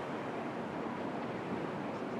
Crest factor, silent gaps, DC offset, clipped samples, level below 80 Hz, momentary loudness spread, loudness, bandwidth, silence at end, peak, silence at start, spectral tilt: 12 dB; none; under 0.1%; under 0.1%; -74 dBFS; 1 LU; -39 LUFS; 13.5 kHz; 0 s; -26 dBFS; 0 s; -7 dB/octave